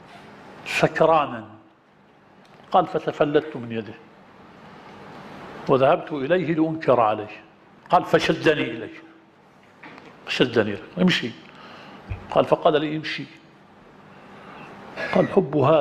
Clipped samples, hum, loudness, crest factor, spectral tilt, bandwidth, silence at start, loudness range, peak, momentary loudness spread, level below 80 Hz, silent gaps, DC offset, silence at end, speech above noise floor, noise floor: under 0.1%; none; -22 LUFS; 22 dB; -6 dB/octave; 14 kHz; 0.15 s; 5 LU; -2 dBFS; 23 LU; -54 dBFS; none; under 0.1%; 0 s; 34 dB; -55 dBFS